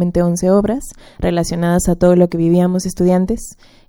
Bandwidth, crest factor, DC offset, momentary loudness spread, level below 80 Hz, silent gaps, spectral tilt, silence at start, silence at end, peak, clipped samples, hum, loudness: 17 kHz; 14 dB; under 0.1%; 11 LU; -32 dBFS; none; -7 dB/octave; 0 s; 0.35 s; 0 dBFS; under 0.1%; none; -15 LUFS